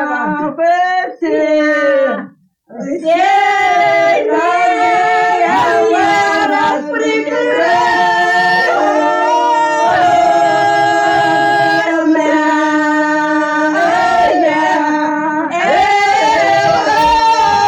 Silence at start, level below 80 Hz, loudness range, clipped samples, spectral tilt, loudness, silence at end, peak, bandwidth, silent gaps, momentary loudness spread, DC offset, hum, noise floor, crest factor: 0 s; -48 dBFS; 2 LU; under 0.1%; -4 dB/octave; -12 LUFS; 0 s; -2 dBFS; 18.5 kHz; none; 5 LU; under 0.1%; none; -39 dBFS; 10 dB